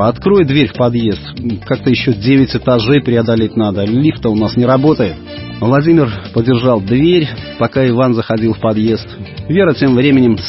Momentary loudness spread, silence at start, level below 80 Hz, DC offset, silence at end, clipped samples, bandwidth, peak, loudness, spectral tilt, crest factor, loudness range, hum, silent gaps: 8 LU; 0 s; -38 dBFS; under 0.1%; 0 s; under 0.1%; 5.8 kHz; 0 dBFS; -12 LUFS; -10.5 dB/octave; 12 dB; 1 LU; none; none